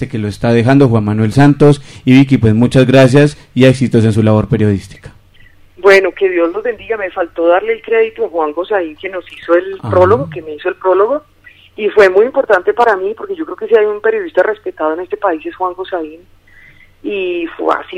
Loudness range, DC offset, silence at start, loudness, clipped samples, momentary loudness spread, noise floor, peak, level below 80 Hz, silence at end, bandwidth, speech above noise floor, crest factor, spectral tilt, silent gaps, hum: 7 LU; under 0.1%; 0 s; -12 LUFS; 0.3%; 12 LU; -42 dBFS; 0 dBFS; -42 dBFS; 0 s; 12 kHz; 30 dB; 12 dB; -7.5 dB/octave; none; none